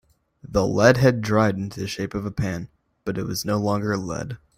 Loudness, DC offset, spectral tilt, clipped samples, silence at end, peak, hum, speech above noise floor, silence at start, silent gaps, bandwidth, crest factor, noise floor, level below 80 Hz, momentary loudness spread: -23 LUFS; under 0.1%; -6 dB/octave; under 0.1%; 0.2 s; -2 dBFS; none; 24 dB; 0.5 s; none; 16 kHz; 20 dB; -46 dBFS; -46 dBFS; 14 LU